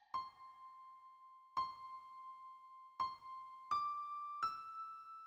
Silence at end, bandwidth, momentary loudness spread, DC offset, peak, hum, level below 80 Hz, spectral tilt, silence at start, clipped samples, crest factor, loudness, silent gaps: 0 s; over 20 kHz; 17 LU; under 0.1%; -28 dBFS; none; -82 dBFS; -2.5 dB/octave; 0 s; under 0.1%; 20 dB; -45 LUFS; none